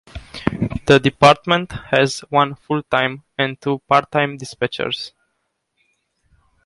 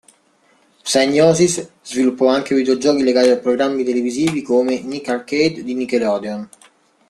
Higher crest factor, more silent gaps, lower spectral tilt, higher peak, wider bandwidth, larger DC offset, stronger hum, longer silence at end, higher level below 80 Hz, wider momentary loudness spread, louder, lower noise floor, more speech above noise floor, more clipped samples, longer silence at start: about the same, 20 dB vs 16 dB; neither; about the same, -5 dB/octave vs -4.5 dB/octave; about the same, 0 dBFS vs -2 dBFS; second, 11.5 kHz vs 13 kHz; neither; neither; first, 1.55 s vs 0.65 s; first, -44 dBFS vs -58 dBFS; about the same, 12 LU vs 11 LU; about the same, -18 LUFS vs -17 LUFS; first, -72 dBFS vs -57 dBFS; first, 55 dB vs 40 dB; neither; second, 0.15 s vs 0.85 s